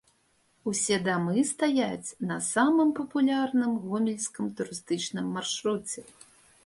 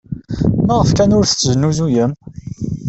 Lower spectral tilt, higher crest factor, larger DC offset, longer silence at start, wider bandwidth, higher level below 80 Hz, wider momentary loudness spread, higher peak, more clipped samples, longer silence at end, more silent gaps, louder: second, -4 dB/octave vs -5.5 dB/octave; first, 18 dB vs 12 dB; neither; first, 0.65 s vs 0.1 s; first, 11.5 kHz vs 8.2 kHz; second, -70 dBFS vs -34 dBFS; second, 9 LU vs 14 LU; second, -12 dBFS vs -2 dBFS; neither; first, 0.65 s vs 0 s; neither; second, -28 LUFS vs -14 LUFS